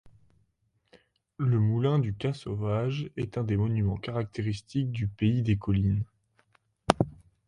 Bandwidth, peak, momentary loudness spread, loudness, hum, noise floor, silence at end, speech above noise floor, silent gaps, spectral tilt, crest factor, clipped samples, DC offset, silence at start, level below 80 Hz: 11.5 kHz; 0 dBFS; 7 LU; -29 LUFS; none; -73 dBFS; 0.35 s; 46 dB; none; -8 dB/octave; 30 dB; under 0.1%; under 0.1%; 0.05 s; -48 dBFS